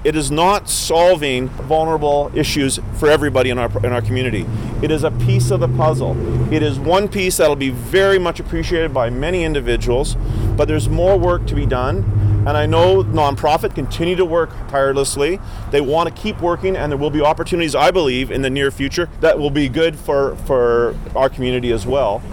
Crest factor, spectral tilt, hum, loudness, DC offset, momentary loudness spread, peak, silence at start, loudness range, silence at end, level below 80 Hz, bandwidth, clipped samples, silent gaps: 10 dB; -5.5 dB/octave; none; -17 LUFS; 0.5%; 6 LU; -6 dBFS; 0 s; 2 LU; 0 s; -28 dBFS; 19 kHz; under 0.1%; none